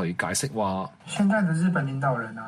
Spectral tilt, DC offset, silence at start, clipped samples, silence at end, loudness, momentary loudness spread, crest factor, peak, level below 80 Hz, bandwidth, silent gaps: -5.5 dB/octave; under 0.1%; 0 s; under 0.1%; 0 s; -26 LUFS; 6 LU; 14 dB; -10 dBFS; -62 dBFS; 13.5 kHz; none